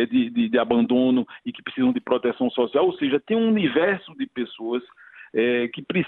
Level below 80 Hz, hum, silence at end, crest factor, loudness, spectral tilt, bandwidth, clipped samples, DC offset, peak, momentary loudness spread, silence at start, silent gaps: -64 dBFS; none; 0 s; 16 dB; -23 LUFS; -9.5 dB/octave; 4.1 kHz; under 0.1%; under 0.1%; -6 dBFS; 10 LU; 0 s; none